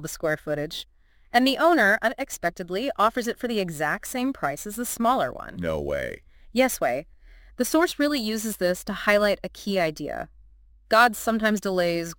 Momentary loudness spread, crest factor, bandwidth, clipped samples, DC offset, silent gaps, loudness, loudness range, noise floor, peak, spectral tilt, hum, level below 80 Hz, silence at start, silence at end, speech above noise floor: 12 LU; 20 dB; 17 kHz; under 0.1%; under 0.1%; none; -24 LUFS; 3 LU; -53 dBFS; -4 dBFS; -4 dB/octave; none; -50 dBFS; 0 s; 0.05 s; 29 dB